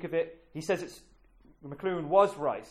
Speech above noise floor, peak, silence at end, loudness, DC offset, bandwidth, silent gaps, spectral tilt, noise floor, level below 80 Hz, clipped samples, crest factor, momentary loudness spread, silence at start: 29 dB; -10 dBFS; 0 s; -30 LUFS; under 0.1%; 14 kHz; none; -6 dB/octave; -60 dBFS; -64 dBFS; under 0.1%; 22 dB; 20 LU; 0 s